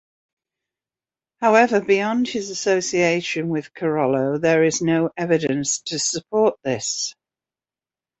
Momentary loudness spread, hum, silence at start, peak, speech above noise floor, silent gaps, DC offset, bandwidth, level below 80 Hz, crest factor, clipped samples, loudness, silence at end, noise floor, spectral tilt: 7 LU; none; 1.4 s; -2 dBFS; over 70 dB; none; under 0.1%; 8.4 kHz; -62 dBFS; 20 dB; under 0.1%; -20 LUFS; 1.1 s; under -90 dBFS; -4 dB/octave